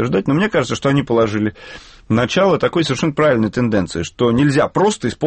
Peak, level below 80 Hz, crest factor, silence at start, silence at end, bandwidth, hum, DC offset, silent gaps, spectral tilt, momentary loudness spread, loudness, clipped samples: -4 dBFS; -44 dBFS; 12 dB; 0 s; 0 s; 8.8 kHz; none; under 0.1%; none; -6 dB/octave; 6 LU; -16 LUFS; under 0.1%